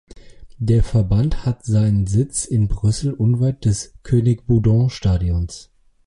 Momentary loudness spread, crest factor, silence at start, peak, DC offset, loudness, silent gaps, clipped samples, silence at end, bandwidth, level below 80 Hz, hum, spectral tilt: 7 LU; 14 dB; 0.15 s; -4 dBFS; under 0.1%; -19 LUFS; none; under 0.1%; 0.45 s; 11.5 kHz; -30 dBFS; none; -7 dB/octave